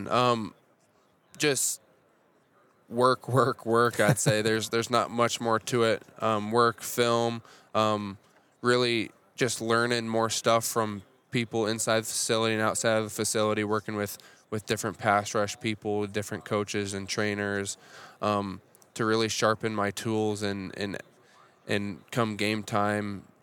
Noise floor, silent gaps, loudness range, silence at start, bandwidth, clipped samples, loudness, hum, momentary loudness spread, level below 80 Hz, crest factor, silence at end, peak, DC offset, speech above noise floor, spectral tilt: -65 dBFS; none; 5 LU; 0 s; 19 kHz; under 0.1%; -28 LUFS; none; 10 LU; -74 dBFS; 22 dB; 0.2 s; -8 dBFS; under 0.1%; 38 dB; -4 dB/octave